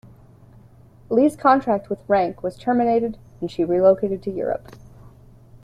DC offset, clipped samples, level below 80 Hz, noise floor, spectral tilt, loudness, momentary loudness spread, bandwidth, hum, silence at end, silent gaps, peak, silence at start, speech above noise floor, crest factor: under 0.1%; under 0.1%; -52 dBFS; -48 dBFS; -7.5 dB/octave; -21 LUFS; 11 LU; 13.5 kHz; none; 0.55 s; none; -4 dBFS; 1.1 s; 29 dB; 18 dB